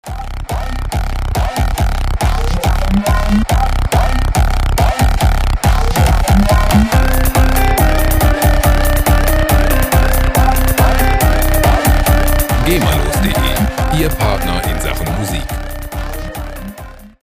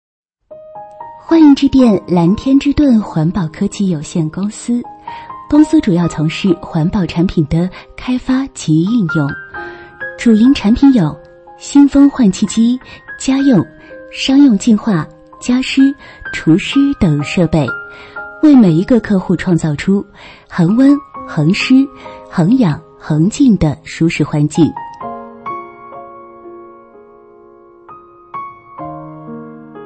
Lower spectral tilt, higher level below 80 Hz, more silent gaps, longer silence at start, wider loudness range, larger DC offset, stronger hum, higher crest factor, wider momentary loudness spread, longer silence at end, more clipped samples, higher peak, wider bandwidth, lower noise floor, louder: second, -5 dB/octave vs -6.5 dB/octave; first, -14 dBFS vs -38 dBFS; neither; second, 0.05 s vs 0.5 s; second, 4 LU vs 8 LU; neither; neither; about the same, 12 dB vs 14 dB; second, 10 LU vs 20 LU; first, 0.2 s vs 0 s; neither; about the same, 0 dBFS vs 0 dBFS; first, 16 kHz vs 8.8 kHz; second, -32 dBFS vs -41 dBFS; about the same, -14 LUFS vs -12 LUFS